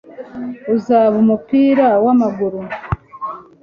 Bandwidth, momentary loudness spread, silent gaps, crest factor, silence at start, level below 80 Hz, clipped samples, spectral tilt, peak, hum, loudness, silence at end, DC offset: 7 kHz; 16 LU; none; 14 dB; 0.1 s; -44 dBFS; under 0.1%; -9 dB/octave; -2 dBFS; none; -15 LUFS; 0.2 s; under 0.1%